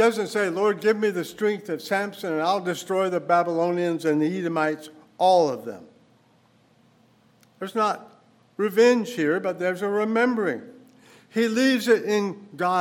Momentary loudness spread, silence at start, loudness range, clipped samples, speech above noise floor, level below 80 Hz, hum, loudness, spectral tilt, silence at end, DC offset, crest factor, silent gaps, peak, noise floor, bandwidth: 11 LU; 0 s; 4 LU; under 0.1%; 37 dB; -80 dBFS; none; -24 LUFS; -5 dB/octave; 0 s; under 0.1%; 18 dB; none; -6 dBFS; -60 dBFS; 18 kHz